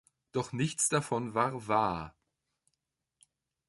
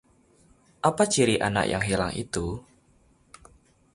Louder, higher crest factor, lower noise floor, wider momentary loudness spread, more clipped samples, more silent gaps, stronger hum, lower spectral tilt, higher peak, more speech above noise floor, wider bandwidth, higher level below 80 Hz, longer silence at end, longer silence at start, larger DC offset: second, -32 LUFS vs -25 LUFS; about the same, 22 dB vs 22 dB; first, -85 dBFS vs -62 dBFS; about the same, 10 LU vs 10 LU; neither; neither; neither; about the same, -4 dB/octave vs -4 dB/octave; second, -12 dBFS vs -6 dBFS; first, 54 dB vs 37 dB; about the same, 11.5 kHz vs 11.5 kHz; second, -64 dBFS vs -48 dBFS; first, 1.6 s vs 1.35 s; second, 0.35 s vs 0.85 s; neither